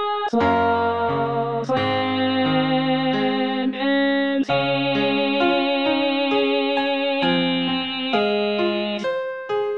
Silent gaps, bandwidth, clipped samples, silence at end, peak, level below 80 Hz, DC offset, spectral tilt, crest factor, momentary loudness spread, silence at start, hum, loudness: none; 6.8 kHz; under 0.1%; 0 s; -6 dBFS; -58 dBFS; 0.3%; -6.5 dB/octave; 14 dB; 4 LU; 0 s; none; -21 LUFS